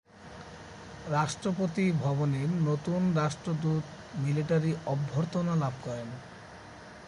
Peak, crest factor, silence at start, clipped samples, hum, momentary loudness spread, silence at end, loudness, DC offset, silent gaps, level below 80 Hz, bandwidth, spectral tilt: -16 dBFS; 14 dB; 0.15 s; under 0.1%; none; 19 LU; 0 s; -30 LUFS; under 0.1%; none; -60 dBFS; 11 kHz; -7 dB/octave